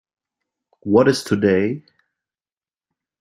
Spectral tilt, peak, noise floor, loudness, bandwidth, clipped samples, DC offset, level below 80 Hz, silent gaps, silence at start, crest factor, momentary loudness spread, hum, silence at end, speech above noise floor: -6 dB/octave; -2 dBFS; under -90 dBFS; -18 LUFS; 15.5 kHz; under 0.1%; under 0.1%; -60 dBFS; none; 0.85 s; 20 dB; 15 LU; none; 1.4 s; over 73 dB